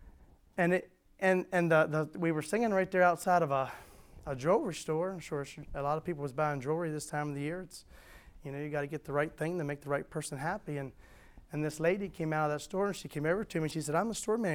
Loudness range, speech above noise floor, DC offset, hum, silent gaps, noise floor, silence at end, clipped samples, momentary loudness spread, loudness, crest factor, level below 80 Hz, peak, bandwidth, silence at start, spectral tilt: 7 LU; 25 dB; under 0.1%; none; none; -58 dBFS; 0 s; under 0.1%; 13 LU; -33 LUFS; 20 dB; -60 dBFS; -14 dBFS; 17.5 kHz; 0 s; -6 dB/octave